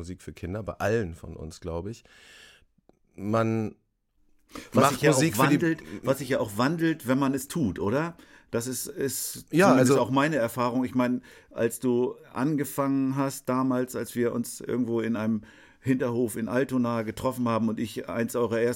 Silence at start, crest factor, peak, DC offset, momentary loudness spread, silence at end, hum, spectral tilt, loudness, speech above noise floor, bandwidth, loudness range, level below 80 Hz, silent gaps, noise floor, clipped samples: 0 s; 20 dB; -6 dBFS; under 0.1%; 13 LU; 0 s; none; -5.5 dB/octave; -27 LUFS; 41 dB; 17 kHz; 7 LU; -56 dBFS; none; -67 dBFS; under 0.1%